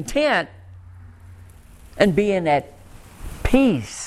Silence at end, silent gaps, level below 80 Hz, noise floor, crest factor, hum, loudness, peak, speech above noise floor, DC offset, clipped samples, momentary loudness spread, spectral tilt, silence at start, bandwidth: 0 s; none; -36 dBFS; -45 dBFS; 22 dB; none; -20 LUFS; 0 dBFS; 26 dB; under 0.1%; under 0.1%; 21 LU; -5.5 dB/octave; 0 s; 14.5 kHz